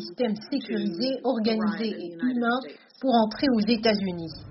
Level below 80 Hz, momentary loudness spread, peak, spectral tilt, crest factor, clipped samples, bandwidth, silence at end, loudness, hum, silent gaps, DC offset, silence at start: -60 dBFS; 8 LU; -10 dBFS; -4 dB/octave; 16 dB; under 0.1%; 6 kHz; 0 s; -26 LUFS; none; none; under 0.1%; 0 s